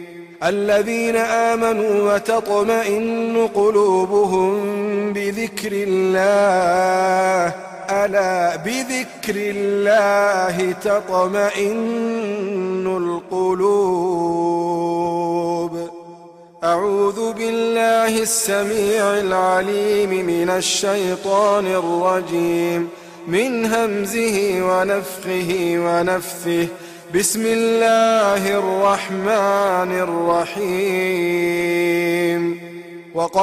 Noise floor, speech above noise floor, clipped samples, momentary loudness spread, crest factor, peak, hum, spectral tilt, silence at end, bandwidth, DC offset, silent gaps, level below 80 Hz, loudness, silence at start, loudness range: -42 dBFS; 24 dB; under 0.1%; 7 LU; 14 dB; -4 dBFS; none; -4 dB/octave; 0 s; 15.5 kHz; under 0.1%; none; -58 dBFS; -18 LUFS; 0 s; 3 LU